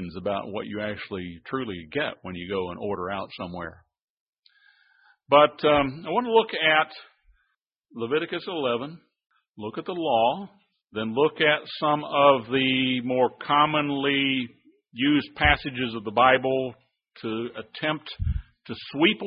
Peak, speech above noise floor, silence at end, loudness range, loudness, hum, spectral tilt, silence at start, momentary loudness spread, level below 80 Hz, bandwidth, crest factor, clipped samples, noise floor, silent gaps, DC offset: -4 dBFS; 51 dB; 0 s; 9 LU; -24 LUFS; none; -9.5 dB/octave; 0 s; 16 LU; -44 dBFS; 5.4 kHz; 22 dB; under 0.1%; -76 dBFS; 4.04-4.33 s, 9.49-9.54 s; under 0.1%